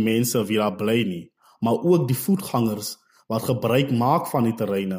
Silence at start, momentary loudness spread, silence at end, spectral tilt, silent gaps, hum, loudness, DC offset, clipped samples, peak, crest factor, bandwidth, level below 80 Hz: 0 s; 9 LU; 0 s; -6 dB/octave; none; none; -23 LUFS; under 0.1%; under 0.1%; -8 dBFS; 14 dB; 16 kHz; -62 dBFS